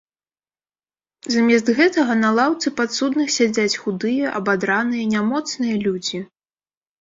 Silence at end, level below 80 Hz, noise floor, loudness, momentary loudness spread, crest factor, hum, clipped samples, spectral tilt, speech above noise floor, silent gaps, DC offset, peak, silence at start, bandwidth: 0.75 s; -64 dBFS; under -90 dBFS; -19 LUFS; 7 LU; 16 dB; none; under 0.1%; -4 dB/octave; over 71 dB; none; under 0.1%; -4 dBFS; 1.25 s; 7.8 kHz